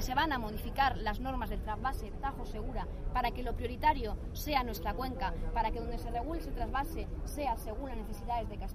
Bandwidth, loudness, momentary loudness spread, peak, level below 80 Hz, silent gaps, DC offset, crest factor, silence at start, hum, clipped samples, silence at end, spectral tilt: 15.5 kHz; -36 LUFS; 9 LU; -16 dBFS; -40 dBFS; none; under 0.1%; 18 dB; 0 s; none; under 0.1%; 0 s; -5.5 dB/octave